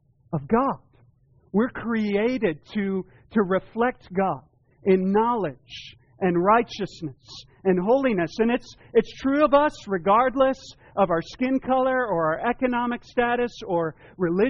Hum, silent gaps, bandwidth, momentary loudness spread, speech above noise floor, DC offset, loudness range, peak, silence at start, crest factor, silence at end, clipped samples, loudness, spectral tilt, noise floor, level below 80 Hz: none; none; 7.2 kHz; 12 LU; 36 dB; under 0.1%; 4 LU; -8 dBFS; 0.3 s; 16 dB; 0 s; under 0.1%; -24 LUFS; -5 dB/octave; -59 dBFS; -52 dBFS